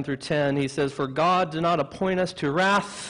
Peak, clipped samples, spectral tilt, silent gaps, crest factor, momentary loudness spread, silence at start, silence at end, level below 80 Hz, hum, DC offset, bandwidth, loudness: -8 dBFS; under 0.1%; -5.5 dB/octave; none; 16 dB; 5 LU; 0 s; 0 s; -56 dBFS; none; under 0.1%; 11 kHz; -24 LUFS